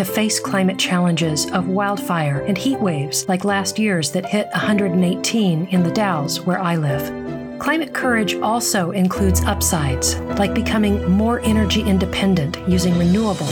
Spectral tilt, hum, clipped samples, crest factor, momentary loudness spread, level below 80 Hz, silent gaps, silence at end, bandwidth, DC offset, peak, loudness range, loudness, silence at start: -5 dB/octave; none; under 0.1%; 14 dB; 3 LU; -34 dBFS; none; 0 s; 19 kHz; under 0.1%; -4 dBFS; 2 LU; -18 LUFS; 0 s